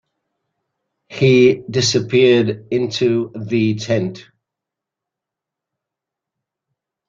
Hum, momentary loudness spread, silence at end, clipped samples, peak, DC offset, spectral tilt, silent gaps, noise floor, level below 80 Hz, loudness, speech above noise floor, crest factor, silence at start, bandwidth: none; 9 LU; 2.85 s; under 0.1%; -2 dBFS; under 0.1%; -5.5 dB/octave; none; -84 dBFS; -56 dBFS; -16 LUFS; 69 dB; 18 dB; 1.1 s; 7.6 kHz